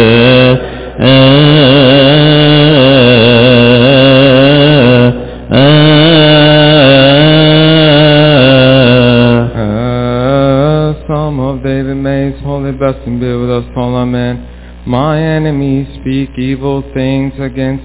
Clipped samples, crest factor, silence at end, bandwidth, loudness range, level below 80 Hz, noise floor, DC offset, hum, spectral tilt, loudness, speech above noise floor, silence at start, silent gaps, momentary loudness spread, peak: 10%; 6 dB; 0 s; 4 kHz; 10 LU; -28 dBFS; -27 dBFS; under 0.1%; none; -10.5 dB/octave; -7 LUFS; 17 dB; 0 s; none; 11 LU; 0 dBFS